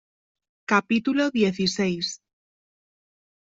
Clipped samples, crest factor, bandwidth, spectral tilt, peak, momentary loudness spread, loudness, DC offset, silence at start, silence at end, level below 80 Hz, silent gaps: under 0.1%; 20 dB; 8 kHz; -4.5 dB/octave; -6 dBFS; 11 LU; -23 LUFS; under 0.1%; 0.7 s; 1.35 s; -64 dBFS; none